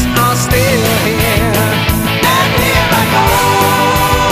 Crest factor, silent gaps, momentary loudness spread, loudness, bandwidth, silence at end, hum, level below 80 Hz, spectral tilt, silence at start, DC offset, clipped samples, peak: 10 dB; none; 2 LU; -11 LUFS; 15.5 kHz; 0 s; none; -24 dBFS; -4 dB/octave; 0 s; under 0.1%; under 0.1%; 0 dBFS